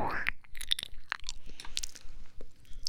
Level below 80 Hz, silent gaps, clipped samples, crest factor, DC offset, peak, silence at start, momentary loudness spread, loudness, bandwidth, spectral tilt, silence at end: -44 dBFS; none; under 0.1%; 24 dB; under 0.1%; -10 dBFS; 0 s; 22 LU; -37 LUFS; 17.5 kHz; -1 dB/octave; 0 s